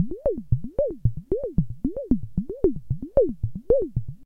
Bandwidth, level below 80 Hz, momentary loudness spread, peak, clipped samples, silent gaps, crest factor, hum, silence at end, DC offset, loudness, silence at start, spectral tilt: 2 kHz; -36 dBFS; 8 LU; -6 dBFS; under 0.1%; none; 18 dB; none; 0 s; under 0.1%; -26 LUFS; 0 s; -13 dB/octave